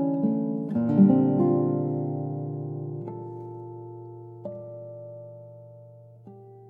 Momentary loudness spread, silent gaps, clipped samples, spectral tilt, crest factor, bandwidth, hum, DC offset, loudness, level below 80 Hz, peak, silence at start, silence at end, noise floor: 23 LU; none; under 0.1%; -13 dB/octave; 20 dB; 3 kHz; none; under 0.1%; -25 LUFS; -76 dBFS; -6 dBFS; 0 s; 0 s; -49 dBFS